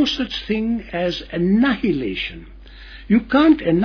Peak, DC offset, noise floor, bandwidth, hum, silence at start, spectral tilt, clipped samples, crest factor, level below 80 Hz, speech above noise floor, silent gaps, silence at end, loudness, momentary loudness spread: -4 dBFS; under 0.1%; -39 dBFS; 5.4 kHz; none; 0 s; -6.5 dB/octave; under 0.1%; 16 dB; -40 dBFS; 20 dB; none; 0 s; -19 LUFS; 13 LU